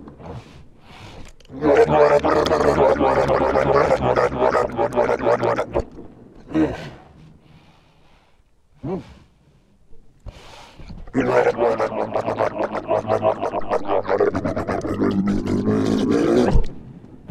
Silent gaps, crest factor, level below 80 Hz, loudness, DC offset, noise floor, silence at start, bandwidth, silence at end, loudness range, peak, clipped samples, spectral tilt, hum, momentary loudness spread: none; 18 dB; -34 dBFS; -19 LUFS; under 0.1%; -55 dBFS; 0 s; 13 kHz; 0.05 s; 19 LU; -2 dBFS; under 0.1%; -7 dB/octave; none; 20 LU